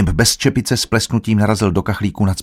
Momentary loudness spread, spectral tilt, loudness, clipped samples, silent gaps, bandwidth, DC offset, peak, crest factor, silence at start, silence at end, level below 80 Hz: 5 LU; -4.5 dB/octave; -16 LUFS; under 0.1%; none; 16.5 kHz; under 0.1%; 0 dBFS; 16 dB; 0 s; 0 s; -32 dBFS